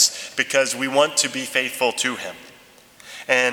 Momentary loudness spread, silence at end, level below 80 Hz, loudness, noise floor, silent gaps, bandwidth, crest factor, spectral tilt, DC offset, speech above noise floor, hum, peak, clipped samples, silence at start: 16 LU; 0 s; -70 dBFS; -20 LUFS; -49 dBFS; none; 20 kHz; 22 dB; -0.5 dB/octave; under 0.1%; 28 dB; none; -2 dBFS; under 0.1%; 0 s